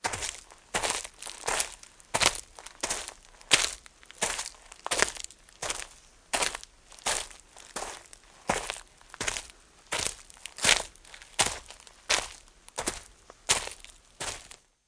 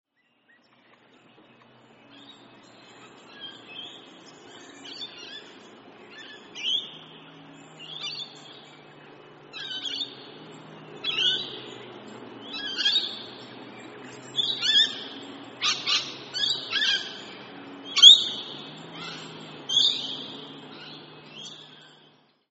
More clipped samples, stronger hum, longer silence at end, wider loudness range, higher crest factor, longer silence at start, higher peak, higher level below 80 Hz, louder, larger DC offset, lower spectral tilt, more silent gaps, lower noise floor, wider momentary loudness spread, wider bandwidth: neither; neither; second, 0.4 s vs 0.75 s; second, 5 LU vs 23 LU; about the same, 30 dB vs 30 dB; second, 0.05 s vs 2.2 s; about the same, -2 dBFS vs 0 dBFS; first, -54 dBFS vs -80 dBFS; second, -30 LUFS vs -21 LUFS; neither; first, 0 dB/octave vs 1.5 dB/octave; neither; second, -54 dBFS vs -65 dBFS; about the same, 21 LU vs 23 LU; first, 10.5 kHz vs 8 kHz